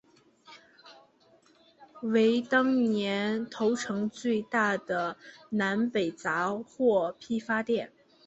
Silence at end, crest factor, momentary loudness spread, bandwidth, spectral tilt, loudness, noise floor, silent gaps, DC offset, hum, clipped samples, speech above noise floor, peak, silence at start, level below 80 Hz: 0.4 s; 18 dB; 8 LU; 8.2 kHz; -5.5 dB/octave; -29 LUFS; -63 dBFS; none; under 0.1%; none; under 0.1%; 34 dB; -12 dBFS; 0.5 s; -72 dBFS